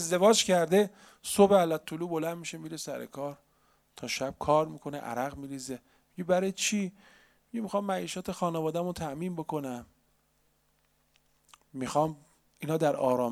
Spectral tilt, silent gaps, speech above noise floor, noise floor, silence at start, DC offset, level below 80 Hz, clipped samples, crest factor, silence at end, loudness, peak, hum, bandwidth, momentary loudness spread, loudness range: -4.5 dB/octave; none; 42 dB; -71 dBFS; 0 s; under 0.1%; -64 dBFS; under 0.1%; 22 dB; 0 s; -30 LUFS; -8 dBFS; none; 16 kHz; 17 LU; 9 LU